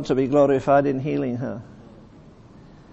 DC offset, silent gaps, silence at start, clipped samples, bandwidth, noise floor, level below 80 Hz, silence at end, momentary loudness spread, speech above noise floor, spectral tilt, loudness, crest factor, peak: under 0.1%; none; 0 s; under 0.1%; 8.2 kHz; -47 dBFS; -52 dBFS; 1 s; 13 LU; 26 dB; -8 dB/octave; -21 LUFS; 18 dB; -6 dBFS